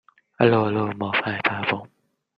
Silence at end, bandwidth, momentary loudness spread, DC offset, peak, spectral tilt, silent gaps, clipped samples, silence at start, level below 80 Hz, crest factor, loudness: 0.5 s; 5.6 kHz; 7 LU; under 0.1%; -2 dBFS; -8.5 dB/octave; none; under 0.1%; 0.4 s; -62 dBFS; 20 dB; -22 LUFS